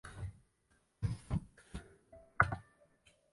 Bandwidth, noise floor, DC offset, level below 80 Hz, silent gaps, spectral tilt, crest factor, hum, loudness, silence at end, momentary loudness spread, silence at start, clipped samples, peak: 11.5 kHz; -75 dBFS; under 0.1%; -52 dBFS; none; -6.5 dB/octave; 30 dB; none; -39 LUFS; 0.7 s; 19 LU; 0.05 s; under 0.1%; -12 dBFS